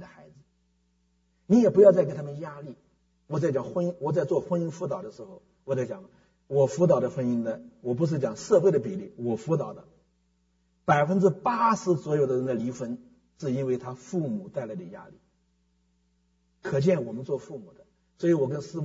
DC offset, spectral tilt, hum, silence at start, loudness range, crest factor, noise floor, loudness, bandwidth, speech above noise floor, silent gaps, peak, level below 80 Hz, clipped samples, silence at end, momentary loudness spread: under 0.1%; -7.5 dB/octave; none; 0 s; 8 LU; 22 dB; -70 dBFS; -26 LUFS; 7.8 kHz; 44 dB; none; -6 dBFS; -66 dBFS; under 0.1%; 0 s; 18 LU